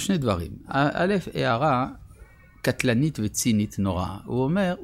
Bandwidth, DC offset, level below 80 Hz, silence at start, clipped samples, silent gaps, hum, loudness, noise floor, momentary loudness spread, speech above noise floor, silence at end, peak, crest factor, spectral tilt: 16.5 kHz; under 0.1%; -48 dBFS; 0 s; under 0.1%; none; none; -25 LUFS; -50 dBFS; 7 LU; 25 dB; 0 s; -8 dBFS; 16 dB; -5.5 dB/octave